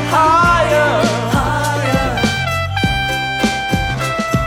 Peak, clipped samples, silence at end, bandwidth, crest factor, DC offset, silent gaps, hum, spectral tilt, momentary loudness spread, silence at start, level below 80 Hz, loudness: -2 dBFS; under 0.1%; 0 s; 19 kHz; 12 dB; under 0.1%; none; none; -5 dB/octave; 6 LU; 0 s; -30 dBFS; -15 LUFS